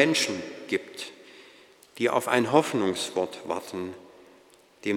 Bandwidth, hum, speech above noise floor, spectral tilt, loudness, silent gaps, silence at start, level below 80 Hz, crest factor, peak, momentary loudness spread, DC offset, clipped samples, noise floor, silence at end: 17.5 kHz; none; 31 dB; -3.5 dB/octave; -27 LUFS; none; 0 s; -76 dBFS; 24 dB; -4 dBFS; 17 LU; under 0.1%; under 0.1%; -57 dBFS; 0 s